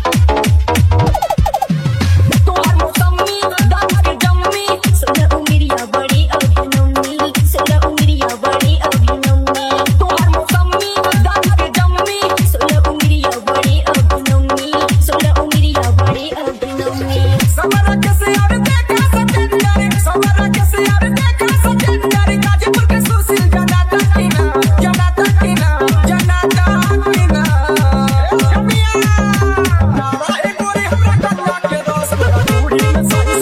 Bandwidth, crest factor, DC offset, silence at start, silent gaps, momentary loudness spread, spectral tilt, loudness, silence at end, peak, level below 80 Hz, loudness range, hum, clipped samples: 16.5 kHz; 12 dB; under 0.1%; 0 s; none; 3 LU; -5.5 dB/octave; -13 LUFS; 0 s; 0 dBFS; -18 dBFS; 1 LU; none; under 0.1%